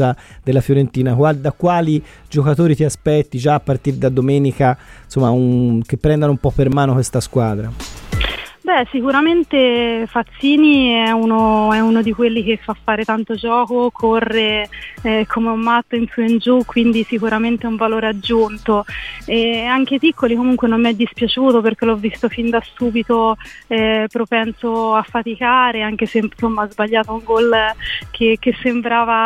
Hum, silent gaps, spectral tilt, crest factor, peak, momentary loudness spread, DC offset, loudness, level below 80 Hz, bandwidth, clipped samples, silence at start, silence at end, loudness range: none; none; -6.5 dB/octave; 14 dB; -2 dBFS; 6 LU; under 0.1%; -16 LUFS; -38 dBFS; 13.5 kHz; under 0.1%; 0 s; 0 s; 3 LU